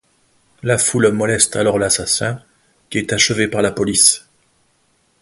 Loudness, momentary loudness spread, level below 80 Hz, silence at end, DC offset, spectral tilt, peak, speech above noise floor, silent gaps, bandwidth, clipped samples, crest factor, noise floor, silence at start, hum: -15 LUFS; 13 LU; -48 dBFS; 1 s; under 0.1%; -3 dB/octave; 0 dBFS; 45 dB; none; 12 kHz; under 0.1%; 18 dB; -61 dBFS; 0.65 s; none